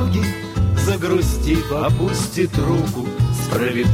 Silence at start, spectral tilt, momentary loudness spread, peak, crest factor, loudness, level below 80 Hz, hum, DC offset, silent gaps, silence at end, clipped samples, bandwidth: 0 s; -6 dB/octave; 3 LU; -6 dBFS; 12 dB; -19 LUFS; -28 dBFS; none; under 0.1%; none; 0 s; under 0.1%; 16.5 kHz